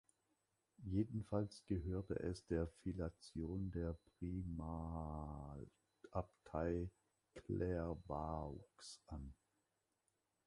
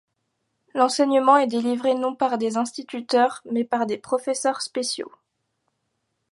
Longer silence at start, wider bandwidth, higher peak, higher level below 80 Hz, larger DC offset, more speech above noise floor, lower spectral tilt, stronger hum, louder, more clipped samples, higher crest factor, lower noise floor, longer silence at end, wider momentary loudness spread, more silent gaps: about the same, 0.8 s vs 0.75 s; about the same, 11.5 kHz vs 11.5 kHz; second, -26 dBFS vs -4 dBFS; first, -56 dBFS vs -76 dBFS; neither; second, 42 dB vs 54 dB; first, -8 dB/octave vs -3 dB/octave; neither; second, -46 LUFS vs -22 LUFS; neither; about the same, 20 dB vs 20 dB; first, -88 dBFS vs -76 dBFS; about the same, 1.15 s vs 1.25 s; about the same, 12 LU vs 11 LU; neither